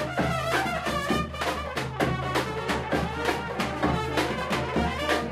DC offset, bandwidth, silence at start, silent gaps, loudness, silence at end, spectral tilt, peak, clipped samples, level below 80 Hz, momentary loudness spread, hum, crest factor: under 0.1%; 16 kHz; 0 s; none; -27 LUFS; 0 s; -5 dB/octave; -10 dBFS; under 0.1%; -42 dBFS; 3 LU; none; 18 dB